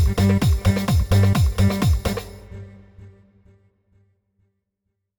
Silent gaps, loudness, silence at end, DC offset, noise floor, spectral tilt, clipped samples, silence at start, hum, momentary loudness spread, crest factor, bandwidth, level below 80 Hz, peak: none; -19 LUFS; 2.1 s; under 0.1%; -77 dBFS; -6.5 dB/octave; under 0.1%; 0 s; none; 21 LU; 14 dB; over 20 kHz; -28 dBFS; -6 dBFS